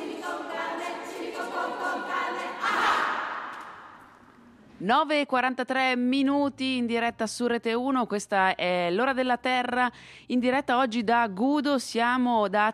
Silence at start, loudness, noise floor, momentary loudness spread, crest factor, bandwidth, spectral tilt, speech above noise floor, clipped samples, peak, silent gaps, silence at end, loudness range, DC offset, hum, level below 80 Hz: 0 s; -26 LUFS; -53 dBFS; 10 LU; 16 dB; 13.5 kHz; -4 dB/octave; 28 dB; under 0.1%; -10 dBFS; none; 0 s; 4 LU; under 0.1%; none; -68 dBFS